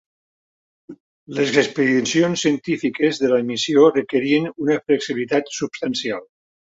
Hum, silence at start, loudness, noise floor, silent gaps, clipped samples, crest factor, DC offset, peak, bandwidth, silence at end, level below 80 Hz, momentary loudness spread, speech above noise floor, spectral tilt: none; 0.9 s; -19 LUFS; under -90 dBFS; 1.00-1.27 s; under 0.1%; 18 dB; under 0.1%; -2 dBFS; 8 kHz; 0.4 s; -64 dBFS; 9 LU; over 71 dB; -4.5 dB/octave